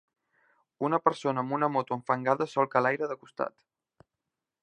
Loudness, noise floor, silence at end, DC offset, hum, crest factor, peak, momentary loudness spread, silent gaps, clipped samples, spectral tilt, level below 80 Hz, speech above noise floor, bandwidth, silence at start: -29 LUFS; -87 dBFS; 1.15 s; under 0.1%; none; 24 dB; -6 dBFS; 9 LU; none; under 0.1%; -6.5 dB/octave; -80 dBFS; 59 dB; 10 kHz; 0.8 s